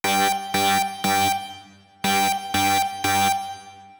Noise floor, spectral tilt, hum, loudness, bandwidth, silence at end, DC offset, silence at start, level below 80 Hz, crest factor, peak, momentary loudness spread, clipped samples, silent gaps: -47 dBFS; -2 dB/octave; none; -21 LUFS; over 20 kHz; 0.05 s; under 0.1%; 0.05 s; -60 dBFS; 14 dB; -10 dBFS; 8 LU; under 0.1%; none